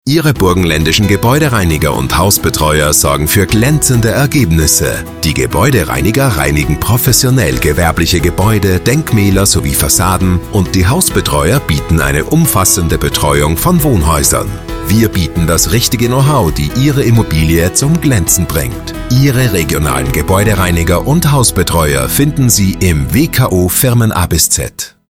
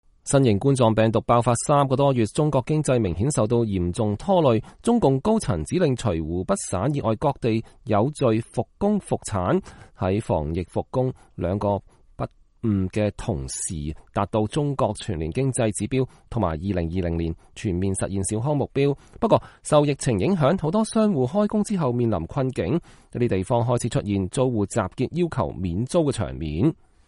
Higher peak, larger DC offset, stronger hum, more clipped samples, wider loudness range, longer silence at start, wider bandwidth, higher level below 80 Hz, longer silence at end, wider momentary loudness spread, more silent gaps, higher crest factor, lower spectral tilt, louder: first, 0 dBFS vs -4 dBFS; first, 0.5% vs under 0.1%; neither; neither; second, 1 LU vs 5 LU; second, 0.05 s vs 0.25 s; first, 19 kHz vs 11.5 kHz; first, -22 dBFS vs -44 dBFS; second, 0.2 s vs 0.35 s; second, 4 LU vs 8 LU; neither; second, 10 dB vs 18 dB; second, -4.5 dB/octave vs -6.5 dB/octave; first, -10 LUFS vs -23 LUFS